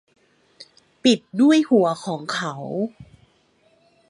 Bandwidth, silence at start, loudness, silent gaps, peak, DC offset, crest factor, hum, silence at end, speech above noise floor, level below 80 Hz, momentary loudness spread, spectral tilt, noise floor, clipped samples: 11.5 kHz; 0.6 s; -20 LUFS; none; -4 dBFS; under 0.1%; 18 dB; none; 1.05 s; 41 dB; -66 dBFS; 11 LU; -5 dB/octave; -61 dBFS; under 0.1%